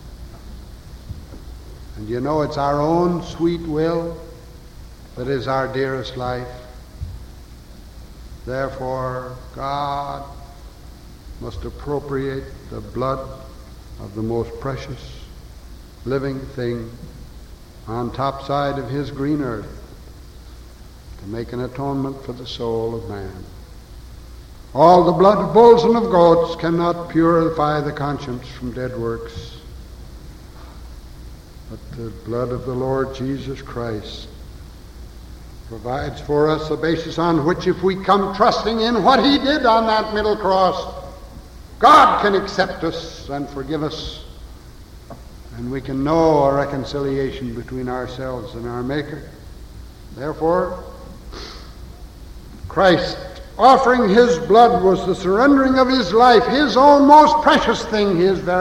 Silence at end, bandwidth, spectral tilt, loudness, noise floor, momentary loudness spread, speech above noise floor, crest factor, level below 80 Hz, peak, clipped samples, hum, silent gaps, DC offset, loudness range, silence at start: 0 s; 16.5 kHz; -6 dB/octave; -18 LUFS; -39 dBFS; 26 LU; 22 dB; 20 dB; -38 dBFS; 0 dBFS; under 0.1%; none; none; under 0.1%; 15 LU; 0 s